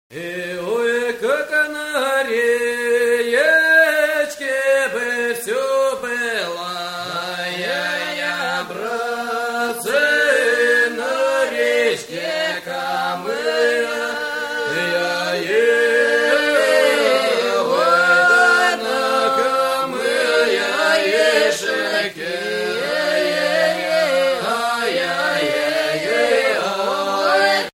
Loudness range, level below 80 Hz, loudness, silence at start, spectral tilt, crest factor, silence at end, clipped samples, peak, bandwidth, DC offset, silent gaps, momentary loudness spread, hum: 6 LU; -62 dBFS; -17 LUFS; 0.1 s; -2 dB/octave; 16 dB; 0.05 s; under 0.1%; -2 dBFS; 16.5 kHz; under 0.1%; none; 9 LU; none